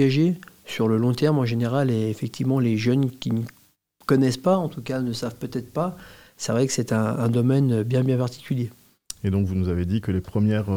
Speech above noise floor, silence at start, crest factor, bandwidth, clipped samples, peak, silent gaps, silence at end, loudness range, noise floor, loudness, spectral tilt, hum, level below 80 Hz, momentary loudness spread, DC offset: 36 dB; 0 s; 16 dB; 16.5 kHz; under 0.1%; -6 dBFS; none; 0 s; 2 LU; -59 dBFS; -24 LUFS; -7 dB/octave; none; -56 dBFS; 9 LU; 0.2%